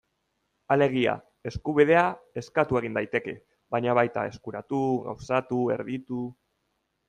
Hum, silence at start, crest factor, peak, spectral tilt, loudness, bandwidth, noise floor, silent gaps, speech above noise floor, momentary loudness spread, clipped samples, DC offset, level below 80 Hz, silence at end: none; 0.7 s; 20 dB; -6 dBFS; -7 dB/octave; -26 LUFS; 9.4 kHz; -76 dBFS; none; 50 dB; 13 LU; under 0.1%; under 0.1%; -58 dBFS; 0.75 s